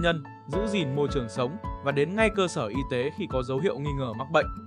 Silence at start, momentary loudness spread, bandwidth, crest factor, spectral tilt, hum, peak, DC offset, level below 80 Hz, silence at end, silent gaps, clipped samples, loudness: 0 s; 7 LU; 10.5 kHz; 20 dB; -6 dB/octave; none; -8 dBFS; under 0.1%; -42 dBFS; 0 s; none; under 0.1%; -28 LUFS